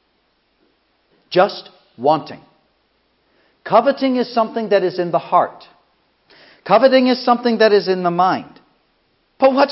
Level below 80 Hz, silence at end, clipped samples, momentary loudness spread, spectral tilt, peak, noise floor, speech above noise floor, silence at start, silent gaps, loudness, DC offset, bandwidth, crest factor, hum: -72 dBFS; 0 s; under 0.1%; 9 LU; -9 dB/octave; 0 dBFS; -63 dBFS; 48 dB; 1.3 s; none; -16 LUFS; under 0.1%; 5.8 kHz; 18 dB; none